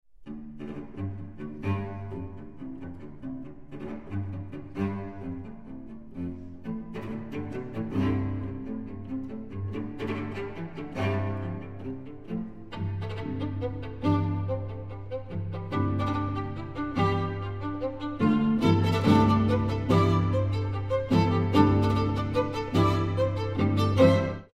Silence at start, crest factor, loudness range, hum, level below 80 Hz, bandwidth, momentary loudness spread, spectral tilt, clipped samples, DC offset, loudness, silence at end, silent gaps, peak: 0 s; 22 dB; 13 LU; none; -48 dBFS; 8.2 kHz; 17 LU; -8 dB/octave; under 0.1%; 0.5%; -28 LUFS; 0 s; none; -6 dBFS